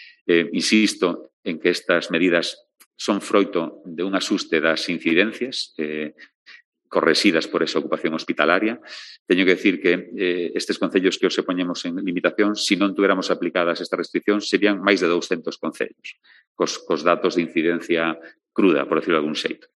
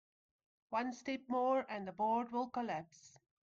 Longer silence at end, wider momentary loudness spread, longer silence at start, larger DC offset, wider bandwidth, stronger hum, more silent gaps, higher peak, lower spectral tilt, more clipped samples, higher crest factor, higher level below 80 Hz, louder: second, 0.2 s vs 0.35 s; about the same, 10 LU vs 9 LU; second, 0 s vs 0.7 s; neither; first, 12 kHz vs 7.6 kHz; neither; first, 0.21-0.26 s, 1.33-1.43 s, 2.86-2.91 s, 6.35-6.46 s, 6.65-6.72 s, 9.19-9.26 s, 16.47-16.55 s vs none; first, 0 dBFS vs -26 dBFS; second, -4 dB/octave vs -5.5 dB/octave; neither; first, 22 dB vs 14 dB; first, -72 dBFS vs -80 dBFS; first, -21 LUFS vs -39 LUFS